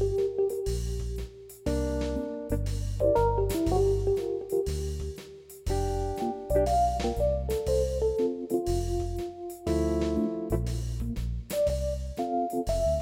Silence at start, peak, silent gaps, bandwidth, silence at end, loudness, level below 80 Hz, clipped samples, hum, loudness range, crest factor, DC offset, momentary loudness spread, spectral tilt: 0 s; -12 dBFS; none; 16.5 kHz; 0 s; -29 LUFS; -36 dBFS; under 0.1%; none; 2 LU; 16 dB; under 0.1%; 9 LU; -7 dB/octave